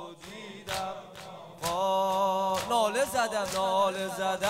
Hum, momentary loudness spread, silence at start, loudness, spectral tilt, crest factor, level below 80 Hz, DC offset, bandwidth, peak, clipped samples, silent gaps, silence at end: none; 17 LU; 0 s; -29 LUFS; -3 dB/octave; 16 dB; -62 dBFS; under 0.1%; 16 kHz; -14 dBFS; under 0.1%; none; 0 s